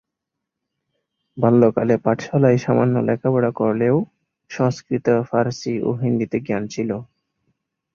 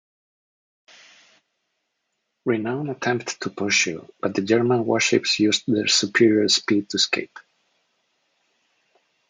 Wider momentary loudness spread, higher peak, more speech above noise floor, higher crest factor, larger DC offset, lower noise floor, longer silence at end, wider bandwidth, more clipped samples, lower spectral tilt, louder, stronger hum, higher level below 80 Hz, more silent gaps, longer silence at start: about the same, 9 LU vs 10 LU; about the same, -2 dBFS vs -4 dBFS; first, 63 dB vs 55 dB; about the same, 18 dB vs 20 dB; neither; first, -82 dBFS vs -77 dBFS; second, 0.9 s vs 1.9 s; second, 7.2 kHz vs 9.6 kHz; neither; first, -8 dB/octave vs -3 dB/octave; about the same, -19 LUFS vs -21 LUFS; neither; first, -58 dBFS vs -72 dBFS; neither; second, 1.35 s vs 2.45 s